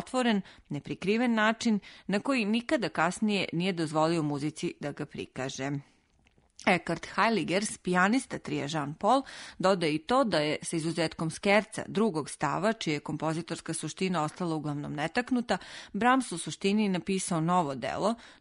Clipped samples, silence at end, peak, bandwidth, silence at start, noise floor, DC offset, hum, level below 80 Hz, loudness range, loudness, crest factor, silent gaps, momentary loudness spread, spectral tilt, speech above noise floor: under 0.1%; 0.1 s; -12 dBFS; 11 kHz; 0 s; -66 dBFS; under 0.1%; none; -64 dBFS; 4 LU; -30 LUFS; 18 dB; none; 9 LU; -5 dB/octave; 37 dB